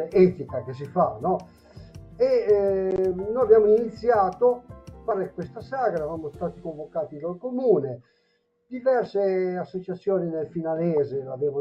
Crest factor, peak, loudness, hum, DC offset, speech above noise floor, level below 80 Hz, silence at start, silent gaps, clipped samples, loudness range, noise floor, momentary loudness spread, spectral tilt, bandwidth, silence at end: 20 dB; -6 dBFS; -24 LUFS; none; under 0.1%; 46 dB; -56 dBFS; 0 s; none; under 0.1%; 7 LU; -69 dBFS; 13 LU; -9 dB/octave; 6.2 kHz; 0 s